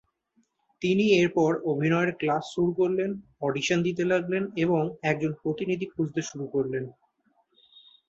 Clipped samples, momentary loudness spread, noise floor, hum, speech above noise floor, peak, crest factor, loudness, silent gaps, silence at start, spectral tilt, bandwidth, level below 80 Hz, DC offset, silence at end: under 0.1%; 9 LU; -70 dBFS; none; 44 dB; -8 dBFS; 18 dB; -27 LUFS; none; 0.8 s; -6 dB/octave; 8 kHz; -66 dBFS; under 0.1%; 1.2 s